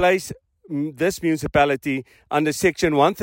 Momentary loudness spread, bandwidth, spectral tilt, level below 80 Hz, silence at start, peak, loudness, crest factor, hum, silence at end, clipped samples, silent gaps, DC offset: 11 LU; 16.5 kHz; -5 dB/octave; -48 dBFS; 0 s; -4 dBFS; -21 LUFS; 16 dB; none; 0 s; under 0.1%; none; under 0.1%